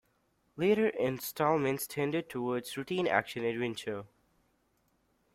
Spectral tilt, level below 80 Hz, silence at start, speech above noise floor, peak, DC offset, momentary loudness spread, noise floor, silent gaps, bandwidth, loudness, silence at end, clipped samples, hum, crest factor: -5 dB/octave; -72 dBFS; 0.55 s; 42 dB; -12 dBFS; under 0.1%; 8 LU; -74 dBFS; none; 16 kHz; -32 LUFS; 1.3 s; under 0.1%; none; 22 dB